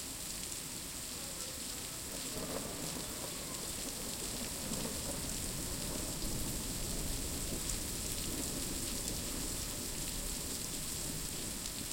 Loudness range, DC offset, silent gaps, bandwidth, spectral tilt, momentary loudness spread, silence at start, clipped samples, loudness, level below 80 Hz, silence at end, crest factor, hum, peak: 2 LU; under 0.1%; none; 17 kHz; -2.5 dB/octave; 3 LU; 0 s; under 0.1%; -38 LUFS; -48 dBFS; 0 s; 22 dB; none; -18 dBFS